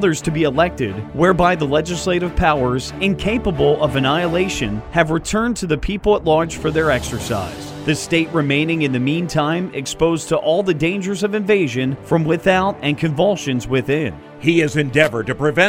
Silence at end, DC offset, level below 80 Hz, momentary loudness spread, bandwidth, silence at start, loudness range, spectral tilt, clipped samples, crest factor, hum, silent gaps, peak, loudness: 0 s; under 0.1%; -36 dBFS; 6 LU; 16 kHz; 0 s; 1 LU; -5.5 dB/octave; under 0.1%; 18 dB; none; none; 0 dBFS; -18 LUFS